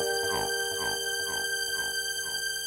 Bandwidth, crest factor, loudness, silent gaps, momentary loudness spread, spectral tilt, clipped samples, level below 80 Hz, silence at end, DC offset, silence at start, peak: 16 kHz; 16 dB; -29 LUFS; none; 2 LU; 0 dB/octave; under 0.1%; -60 dBFS; 0 s; under 0.1%; 0 s; -16 dBFS